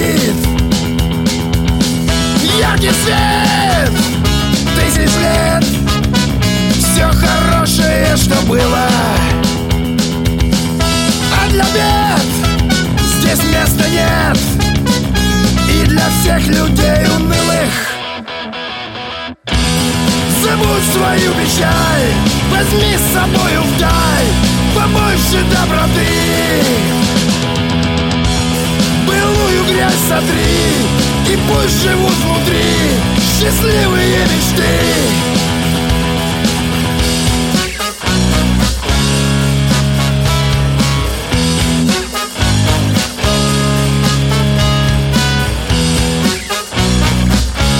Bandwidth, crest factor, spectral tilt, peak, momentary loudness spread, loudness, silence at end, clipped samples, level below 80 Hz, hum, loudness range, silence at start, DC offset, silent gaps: 17 kHz; 12 dB; -4.5 dB/octave; 0 dBFS; 3 LU; -12 LUFS; 0 s; under 0.1%; -20 dBFS; none; 2 LU; 0 s; under 0.1%; none